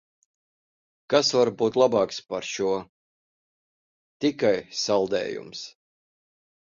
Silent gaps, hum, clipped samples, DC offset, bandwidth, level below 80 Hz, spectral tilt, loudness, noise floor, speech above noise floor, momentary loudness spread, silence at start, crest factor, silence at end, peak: 2.89-4.20 s; none; under 0.1%; under 0.1%; 7.6 kHz; -66 dBFS; -4 dB/octave; -24 LUFS; under -90 dBFS; over 66 dB; 12 LU; 1.1 s; 20 dB; 1.05 s; -6 dBFS